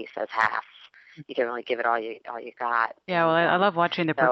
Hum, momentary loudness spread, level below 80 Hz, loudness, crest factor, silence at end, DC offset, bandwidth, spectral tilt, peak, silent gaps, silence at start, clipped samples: none; 13 LU; -76 dBFS; -25 LUFS; 20 dB; 0 s; under 0.1%; 7.6 kHz; -6.5 dB/octave; -6 dBFS; none; 0 s; under 0.1%